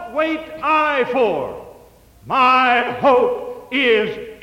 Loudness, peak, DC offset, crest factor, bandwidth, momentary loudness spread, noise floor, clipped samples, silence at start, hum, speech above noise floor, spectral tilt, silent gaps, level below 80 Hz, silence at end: -17 LUFS; -4 dBFS; under 0.1%; 14 dB; 16 kHz; 11 LU; -47 dBFS; under 0.1%; 0 s; none; 30 dB; -5 dB/octave; none; -54 dBFS; 0.1 s